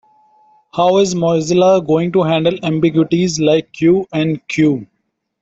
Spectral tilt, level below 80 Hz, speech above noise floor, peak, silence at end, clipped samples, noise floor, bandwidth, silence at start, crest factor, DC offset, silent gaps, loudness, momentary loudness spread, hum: -6 dB/octave; -52 dBFS; 38 dB; -2 dBFS; 0.6 s; under 0.1%; -52 dBFS; 8 kHz; 0.75 s; 12 dB; under 0.1%; none; -14 LUFS; 6 LU; none